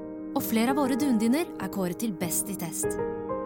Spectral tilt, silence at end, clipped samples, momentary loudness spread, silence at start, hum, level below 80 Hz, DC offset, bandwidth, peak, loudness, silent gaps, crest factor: -4.5 dB/octave; 0 s; under 0.1%; 7 LU; 0 s; none; -56 dBFS; under 0.1%; 17.5 kHz; -12 dBFS; -28 LUFS; none; 16 dB